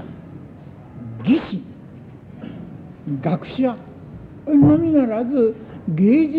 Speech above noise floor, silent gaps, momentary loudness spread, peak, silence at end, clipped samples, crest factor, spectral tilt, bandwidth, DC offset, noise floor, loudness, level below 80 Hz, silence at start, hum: 23 dB; none; 25 LU; -4 dBFS; 0 s; under 0.1%; 16 dB; -10.5 dB/octave; 4.6 kHz; under 0.1%; -39 dBFS; -19 LUFS; -50 dBFS; 0 s; none